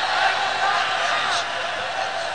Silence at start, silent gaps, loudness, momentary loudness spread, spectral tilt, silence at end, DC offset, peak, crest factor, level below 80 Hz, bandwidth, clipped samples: 0 s; none; -21 LUFS; 5 LU; -0.5 dB/octave; 0 s; 0.6%; -8 dBFS; 16 dB; -64 dBFS; 10 kHz; under 0.1%